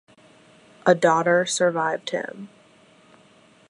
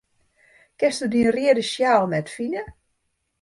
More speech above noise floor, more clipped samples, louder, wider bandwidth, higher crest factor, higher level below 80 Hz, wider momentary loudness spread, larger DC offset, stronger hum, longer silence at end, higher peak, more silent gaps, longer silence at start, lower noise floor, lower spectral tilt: second, 34 dB vs 53 dB; neither; about the same, -21 LUFS vs -21 LUFS; about the same, 11 kHz vs 11.5 kHz; about the same, 22 dB vs 18 dB; second, -76 dBFS vs -58 dBFS; first, 18 LU vs 10 LU; neither; neither; first, 1.25 s vs 0.7 s; first, -2 dBFS vs -6 dBFS; neither; about the same, 0.85 s vs 0.8 s; second, -55 dBFS vs -74 dBFS; about the same, -4 dB/octave vs -5 dB/octave